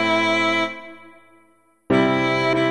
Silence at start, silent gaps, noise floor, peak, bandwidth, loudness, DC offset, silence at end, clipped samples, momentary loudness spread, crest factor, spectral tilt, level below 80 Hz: 0 s; none; -59 dBFS; -4 dBFS; 11 kHz; -19 LUFS; under 0.1%; 0 s; under 0.1%; 13 LU; 16 dB; -5.5 dB/octave; -56 dBFS